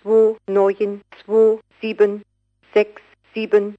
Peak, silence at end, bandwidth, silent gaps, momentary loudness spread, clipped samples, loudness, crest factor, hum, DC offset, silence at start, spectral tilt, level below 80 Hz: -4 dBFS; 0.05 s; 5.8 kHz; none; 12 LU; under 0.1%; -19 LUFS; 16 dB; none; under 0.1%; 0.05 s; -7 dB/octave; -70 dBFS